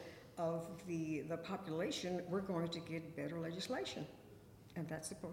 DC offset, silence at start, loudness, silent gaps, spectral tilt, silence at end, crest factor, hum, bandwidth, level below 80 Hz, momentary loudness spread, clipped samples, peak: under 0.1%; 0 s; -44 LUFS; none; -5 dB/octave; 0 s; 16 dB; none; 16.5 kHz; -72 dBFS; 12 LU; under 0.1%; -28 dBFS